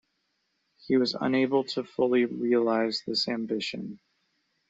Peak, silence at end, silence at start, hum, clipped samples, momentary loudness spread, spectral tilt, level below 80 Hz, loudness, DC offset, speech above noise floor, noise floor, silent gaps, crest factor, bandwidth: -12 dBFS; 0.75 s; 0.85 s; none; under 0.1%; 8 LU; -5.5 dB/octave; -72 dBFS; -27 LUFS; under 0.1%; 50 dB; -76 dBFS; none; 16 dB; 8 kHz